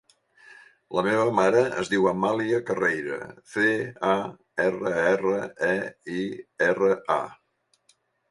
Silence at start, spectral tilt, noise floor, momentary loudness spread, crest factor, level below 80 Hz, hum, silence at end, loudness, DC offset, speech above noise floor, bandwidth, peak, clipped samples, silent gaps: 0.5 s; -5.5 dB/octave; -66 dBFS; 10 LU; 20 dB; -64 dBFS; none; 1 s; -25 LUFS; under 0.1%; 42 dB; 11.5 kHz; -6 dBFS; under 0.1%; none